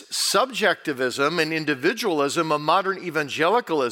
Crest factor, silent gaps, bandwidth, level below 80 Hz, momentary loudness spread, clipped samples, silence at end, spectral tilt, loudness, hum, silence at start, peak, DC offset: 18 dB; none; 17 kHz; -78 dBFS; 5 LU; under 0.1%; 0 s; -3 dB/octave; -22 LUFS; none; 0 s; -6 dBFS; under 0.1%